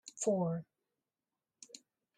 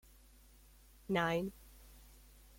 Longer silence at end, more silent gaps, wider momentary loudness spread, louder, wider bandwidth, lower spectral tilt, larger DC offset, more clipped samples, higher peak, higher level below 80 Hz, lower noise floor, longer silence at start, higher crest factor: about the same, 0.4 s vs 0.4 s; neither; second, 21 LU vs 26 LU; about the same, -36 LUFS vs -37 LUFS; second, 12 kHz vs 16.5 kHz; about the same, -6 dB/octave vs -5.5 dB/octave; neither; neither; about the same, -20 dBFS vs -20 dBFS; second, -84 dBFS vs -62 dBFS; first, under -90 dBFS vs -62 dBFS; second, 0.05 s vs 1.1 s; about the same, 20 dB vs 22 dB